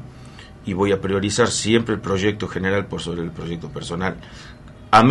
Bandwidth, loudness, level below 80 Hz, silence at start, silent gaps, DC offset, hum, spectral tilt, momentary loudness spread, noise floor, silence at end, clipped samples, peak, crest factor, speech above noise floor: 11.5 kHz; -21 LUFS; -46 dBFS; 0 s; none; under 0.1%; none; -5 dB/octave; 22 LU; -40 dBFS; 0 s; under 0.1%; 0 dBFS; 20 dB; 18 dB